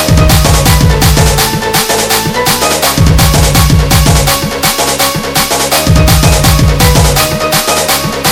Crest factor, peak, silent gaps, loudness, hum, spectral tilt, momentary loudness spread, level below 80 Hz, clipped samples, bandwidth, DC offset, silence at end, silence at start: 8 dB; 0 dBFS; none; -8 LUFS; none; -4 dB/octave; 3 LU; -14 dBFS; 2%; over 20 kHz; under 0.1%; 0 s; 0 s